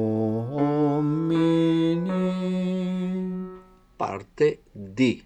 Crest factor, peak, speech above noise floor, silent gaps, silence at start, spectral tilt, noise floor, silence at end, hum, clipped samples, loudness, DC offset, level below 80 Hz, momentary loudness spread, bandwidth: 16 dB; -10 dBFS; 22 dB; none; 0 s; -8 dB/octave; -47 dBFS; 0.05 s; none; under 0.1%; -25 LUFS; under 0.1%; -58 dBFS; 11 LU; 8.8 kHz